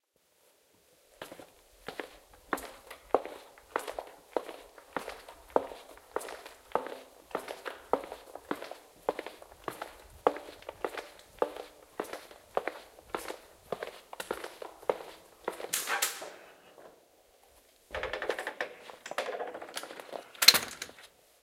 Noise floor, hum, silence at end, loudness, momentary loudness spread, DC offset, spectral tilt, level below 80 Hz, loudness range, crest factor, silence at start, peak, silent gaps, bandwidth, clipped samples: -69 dBFS; none; 0.35 s; -34 LUFS; 16 LU; under 0.1%; -0.5 dB/octave; -66 dBFS; 9 LU; 36 dB; 1.2 s; -2 dBFS; none; 16.5 kHz; under 0.1%